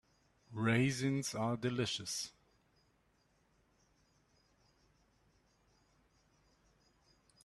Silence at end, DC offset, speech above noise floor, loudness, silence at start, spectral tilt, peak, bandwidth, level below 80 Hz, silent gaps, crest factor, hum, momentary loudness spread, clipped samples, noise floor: 5.15 s; under 0.1%; 39 dB; -36 LUFS; 0.5 s; -4.5 dB/octave; -18 dBFS; 13 kHz; -74 dBFS; none; 24 dB; none; 9 LU; under 0.1%; -75 dBFS